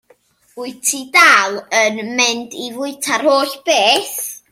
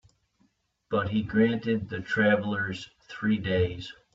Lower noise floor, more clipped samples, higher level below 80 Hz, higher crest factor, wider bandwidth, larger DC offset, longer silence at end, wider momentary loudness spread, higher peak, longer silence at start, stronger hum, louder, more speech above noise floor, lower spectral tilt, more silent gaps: second, -54 dBFS vs -70 dBFS; neither; second, -70 dBFS vs -56 dBFS; about the same, 16 dB vs 18 dB; first, 16.5 kHz vs 7.8 kHz; neither; about the same, 0.15 s vs 0.2 s; first, 15 LU vs 10 LU; first, 0 dBFS vs -12 dBFS; second, 0.55 s vs 0.9 s; neither; first, -14 LUFS vs -27 LUFS; second, 38 dB vs 43 dB; second, -0.5 dB/octave vs -7 dB/octave; neither